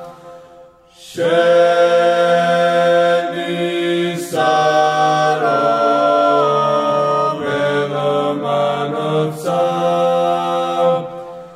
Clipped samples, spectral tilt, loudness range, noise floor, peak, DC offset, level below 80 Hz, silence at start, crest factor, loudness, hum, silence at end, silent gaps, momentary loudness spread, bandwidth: under 0.1%; -5 dB/octave; 3 LU; -43 dBFS; -2 dBFS; under 0.1%; -64 dBFS; 0 s; 12 dB; -15 LUFS; none; 0 s; none; 7 LU; 14.5 kHz